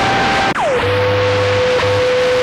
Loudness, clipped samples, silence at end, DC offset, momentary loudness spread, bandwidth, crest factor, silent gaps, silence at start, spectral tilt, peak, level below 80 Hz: -14 LUFS; under 0.1%; 0 s; under 0.1%; 1 LU; 12 kHz; 8 dB; none; 0 s; -4.5 dB/octave; -6 dBFS; -38 dBFS